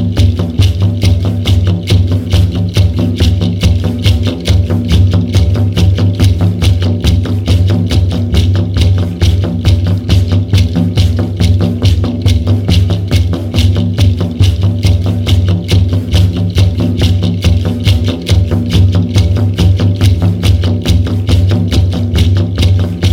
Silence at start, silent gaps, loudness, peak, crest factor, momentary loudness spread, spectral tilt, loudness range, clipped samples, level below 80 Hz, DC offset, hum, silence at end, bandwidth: 0 s; none; -11 LUFS; 0 dBFS; 10 dB; 2 LU; -7 dB/octave; 1 LU; under 0.1%; -20 dBFS; under 0.1%; none; 0 s; 15 kHz